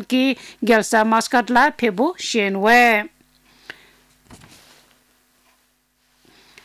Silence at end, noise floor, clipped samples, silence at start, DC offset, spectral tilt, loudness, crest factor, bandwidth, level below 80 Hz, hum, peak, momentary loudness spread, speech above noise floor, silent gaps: 2.3 s; -64 dBFS; under 0.1%; 0 s; under 0.1%; -3.5 dB/octave; -17 LUFS; 16 dB; 16 kHz; -60 dBFS; none; -4 dBFS; 9 LU; 47 dB; none